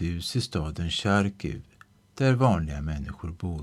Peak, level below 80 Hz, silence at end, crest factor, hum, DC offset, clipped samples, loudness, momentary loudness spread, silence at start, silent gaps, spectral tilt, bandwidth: -8 dBFS; -40 dBFS; 0 s; 18 dB; none; under 0.1%; under 0.1%; -27 LUFS; 13 LU; 0 s; none; -6 dB/octave; 13 kHz